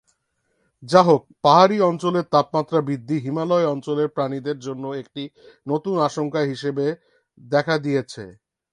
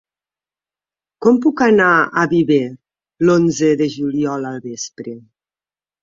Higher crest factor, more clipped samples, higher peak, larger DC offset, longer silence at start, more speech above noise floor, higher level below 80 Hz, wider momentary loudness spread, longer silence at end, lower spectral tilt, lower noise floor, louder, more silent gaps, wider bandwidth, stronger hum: about the same, 20 dB vs 16 dB; neither; about the same, 0 dBFS vs -2 dBFS; neither; second, 0.8 s vs 1.2 s; second, 50 dB vs over 75 dB; second, -64 dBFS vs -58 dBFS; about the same, 17 LU vs 15 LU; second, 0.4 s vs 0.85 s; about the same, -6.5 dB/octave vs -5.5 dB/octave; second, -71 dBFS vs under -90 dBFS; second, -21 LUFS vs -15 LUFS; neither; first, 11 kHz vs 7.6 kHz; neither